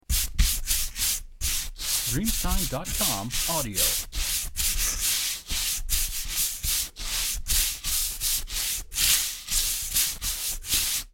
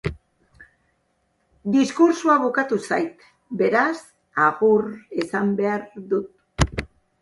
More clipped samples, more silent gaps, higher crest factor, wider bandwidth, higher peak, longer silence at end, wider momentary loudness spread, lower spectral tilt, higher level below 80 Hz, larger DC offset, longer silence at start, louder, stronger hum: neither; neither; about the same, 20 dB vs 20 dB; first, 17 kHz vs 11.5 kHz; second, -6 dBFS vs -2 dBFS; second, 0.05 s vs 0.35 s; second, 4 LU vs 14 LU; second, -1 dB/octave vs -6 dB/octave; first, -34 dBFS vs -42 dBFS; neither; about the same, 0.1 s vs 0.05 s; second, -25 LUFS vs -21 LUFS; neither